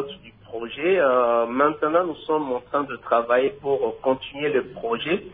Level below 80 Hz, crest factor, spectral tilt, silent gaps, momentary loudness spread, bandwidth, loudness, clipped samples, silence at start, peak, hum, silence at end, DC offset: -58 dBFS; 16 dB; -9 dB/octave; none; 9 LU; 4.7 kHz; -23 LUFS; under 0.1%; 0 s; -6 dBFS; none; 0 s; under 0.1%